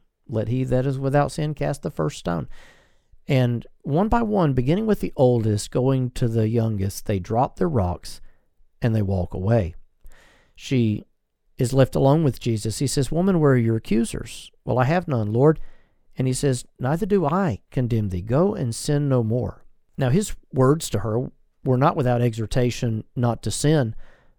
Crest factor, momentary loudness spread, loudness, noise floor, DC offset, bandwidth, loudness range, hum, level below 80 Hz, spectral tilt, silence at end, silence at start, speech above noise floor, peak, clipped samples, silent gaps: 20 dB; 9 LU; -22 LUFS; -64 dBFS; under 0.1%; 18 kHz; 4 LU; none; -40 dBFS; -7 dB/octave; 0.3 s; 0.3 s; 43 dB; -2 dBFS; under 0.1%; none